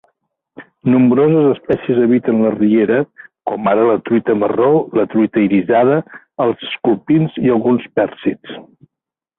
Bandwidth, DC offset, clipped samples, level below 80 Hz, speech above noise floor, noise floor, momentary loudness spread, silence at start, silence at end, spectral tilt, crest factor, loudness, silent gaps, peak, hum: 4 kHz; under 0.1%; under 0.1%; -54 dBFS; 70 dB; -84 dBFS; 10 LU; 0.6 s; 0.75 s; -11 dB/octave; 12 dB; -15 LUFS; none; -2 dBFS; none